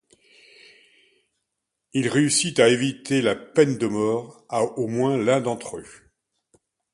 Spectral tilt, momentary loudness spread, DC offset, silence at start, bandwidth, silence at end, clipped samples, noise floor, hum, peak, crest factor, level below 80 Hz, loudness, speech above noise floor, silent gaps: -4.5 dB/octave; 11 LU; under 0.1%; 1.95 s; 11.5 kHz; 1.05 s; under 0.1%; -81 dBFS; none; -2 dBFS; 22 dB; -64 dBFS; -22 LUFS; 59 dB; none